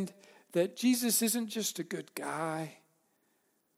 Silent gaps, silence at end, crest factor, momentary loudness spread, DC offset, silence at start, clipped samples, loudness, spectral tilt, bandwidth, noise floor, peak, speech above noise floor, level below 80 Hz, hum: none; 1.05 s; 18 dB; 12 LU; under 0.1%; 0 s; under 0.1%; -32 LUFS; -3.5 dB/octave; 16.5 kHz; -75 dBFS; -16 dBFS; 42 dB; -86 dBFS; none